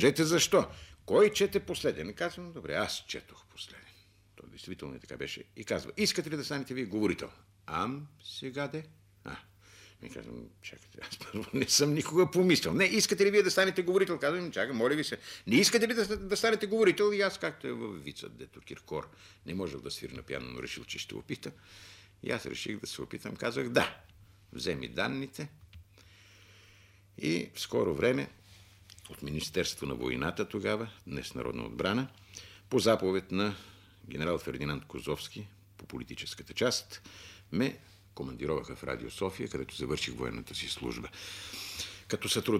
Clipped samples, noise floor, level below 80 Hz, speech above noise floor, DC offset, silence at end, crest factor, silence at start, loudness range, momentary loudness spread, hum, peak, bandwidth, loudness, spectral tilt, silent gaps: under 0.1%; -61 dBFS; -58 dBFS; 28 dB; under 0.1%; 0 s; 22 dB; 0 s; 12 LU; 21 LU; none; -10 dBFS; 16 kHz; -32 LUFS; -4 dB/octave; none